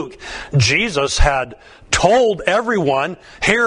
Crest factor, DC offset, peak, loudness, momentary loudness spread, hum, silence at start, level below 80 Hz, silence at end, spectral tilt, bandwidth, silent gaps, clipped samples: 16 dB; under 0.1%; 0 dBFS; -16 LUFS; 11 LU; none; 0 s; -26 dBFS; 0 s; -4 dB/octave; 11 kHz; none; under 0.1%